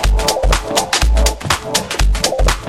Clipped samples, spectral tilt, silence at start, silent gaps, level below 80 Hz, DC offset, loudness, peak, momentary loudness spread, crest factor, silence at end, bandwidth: under 0.1%; -3 dB/octave; 0 s; none; -16 dBFS; under 0.1%; -16 LUFS; 0 dBFS; 3 LU; 14 dB; 0 s; 15.5 kHz